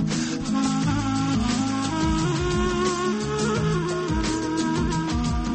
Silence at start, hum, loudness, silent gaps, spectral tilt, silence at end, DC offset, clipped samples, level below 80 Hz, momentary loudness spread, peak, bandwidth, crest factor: 0 s; none; -24 LUFS; none; -5.5 dB/octave; 0 s; under 0.1%; under 0.1%; -34 dBFS; 2 LU; -12 dBFS; 8.8 kHz; 12 dB